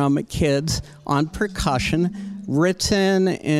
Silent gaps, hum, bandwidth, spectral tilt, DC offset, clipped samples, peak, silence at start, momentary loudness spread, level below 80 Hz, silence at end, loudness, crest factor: none; none; 15 kHz; -5 dB/octave; under 0.1%; under 0.1%; -6 dBFS; 0 s; 7 LU; -38 dBFS; 0 s; -21 LUFS; 16 dB